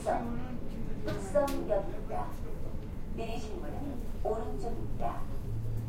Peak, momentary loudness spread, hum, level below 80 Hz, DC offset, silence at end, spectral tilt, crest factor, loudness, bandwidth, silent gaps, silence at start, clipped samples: -16 dBFS; 10 LU; none; -38 dBFS; under 0.1%; 0 s; -7 dB/octave; 16 dB; -37 LUFS; 15.5 kHz; none; 0 s; under 0.1%